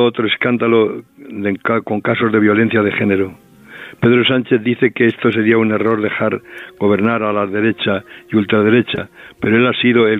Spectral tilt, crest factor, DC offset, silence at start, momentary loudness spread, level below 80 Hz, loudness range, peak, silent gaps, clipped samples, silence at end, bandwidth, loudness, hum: -8.5 dB/octave; 14 dB; under 0.1%; 0 s; 10 LU; -60 dBFS; 2 LU; 0 dBFS; none; under 0.1%; 0 s; 4.1 kHz; -15 LUFS; none